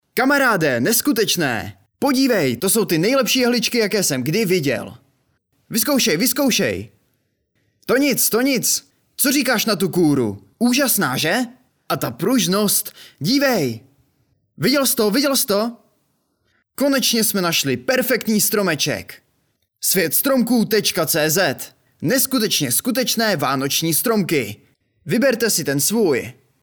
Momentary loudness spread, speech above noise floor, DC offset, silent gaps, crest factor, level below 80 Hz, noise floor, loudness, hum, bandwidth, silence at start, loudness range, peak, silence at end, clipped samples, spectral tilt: 8 LU; 50 dB; under 0.1%; none; 14 dB; -62 dBFS; -68 dBFS; -18 LUFS; none; over 20 kHz; 0.15 s; 2 LU; -4 dBFS; 0.3 s; under 0.1%; -3 dB/octave